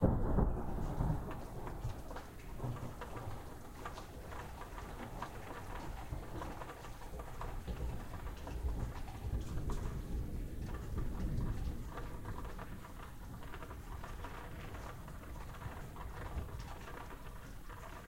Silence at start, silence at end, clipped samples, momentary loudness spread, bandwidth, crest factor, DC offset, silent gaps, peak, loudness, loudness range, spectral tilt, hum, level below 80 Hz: 0 s; 0 s; under 0.1%; 10 LU; 16 kHz; 24 dB; under 0.1%; none; -18 dBFS; -45 LUFS; 6 LU; -7 dB/octave; none; -44 dBFS